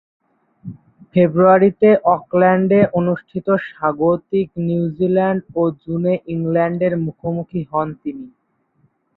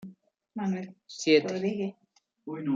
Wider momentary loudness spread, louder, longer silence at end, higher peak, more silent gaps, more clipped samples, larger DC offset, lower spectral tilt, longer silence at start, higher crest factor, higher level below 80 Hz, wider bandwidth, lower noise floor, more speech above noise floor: second, 12 LU vs 19 LU; first, -17 LUFS vs -29 LUFS; first, 0.9 s vs 0 s; first, -2 dBFS vs -10 dBFS; neither; neither; neither; first, -12 dB/octave vs -5 dB/octave; first, 0.65 s vs 0 s; about the same, 16 dB vs 20 dB; first, -54 dBFS vs -78 dBFS; second, 4.1 kHz vs 7.8 kHz; first, -61 dBFS vs -53 dBFS; first, 45 dB vs 25 dB